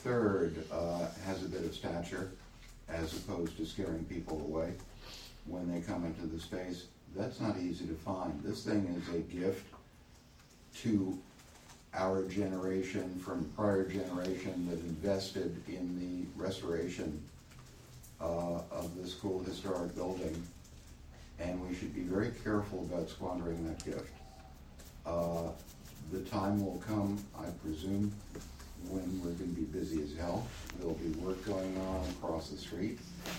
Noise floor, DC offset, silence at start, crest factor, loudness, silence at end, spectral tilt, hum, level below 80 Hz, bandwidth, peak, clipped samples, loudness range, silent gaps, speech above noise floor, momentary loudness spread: -60 dBFS; under 0.1%; 0 s; 20 dB; -39 LUFS; 0 s; -6 dB/octave; none; -54 dBFS; 17 kHz; -18 dBFS; under 0.1%; 4 LU; none; 22 dB; 15 LU